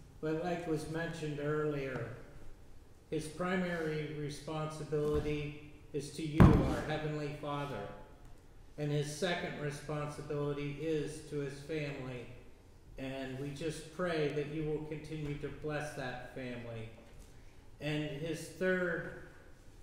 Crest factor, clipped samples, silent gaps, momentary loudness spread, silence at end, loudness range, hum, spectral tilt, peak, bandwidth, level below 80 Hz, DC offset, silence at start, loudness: 30 dB; under 0.1%; none; 13 LU; 0 s; 9 LU; none; -6.5 dB/octave; -8 dBFS; 16 kHz; -48 dBFS; under 0.1%; 0 s; -37 LUFS